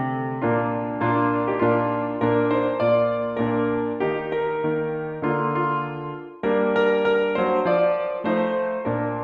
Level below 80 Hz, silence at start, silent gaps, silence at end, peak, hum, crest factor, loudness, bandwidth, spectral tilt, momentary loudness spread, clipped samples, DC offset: -56 dBFS; 0 s; none; 0 s; -8 dBFS; none; 14 dB; -23 LUFS; 5.2 kHz; -9 dB/octave; 6 LU; under 0.1%; under 0.1%